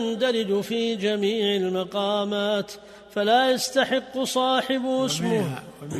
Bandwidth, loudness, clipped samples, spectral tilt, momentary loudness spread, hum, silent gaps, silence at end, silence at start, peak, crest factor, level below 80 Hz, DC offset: 13.5 kHz; -24 LUFS; under 0.1%; -4 dB/octave; 6 LU; none; none; 0 s; 0 s; -8 dBFS; 16 dB; -64 dBFS; under 0.1%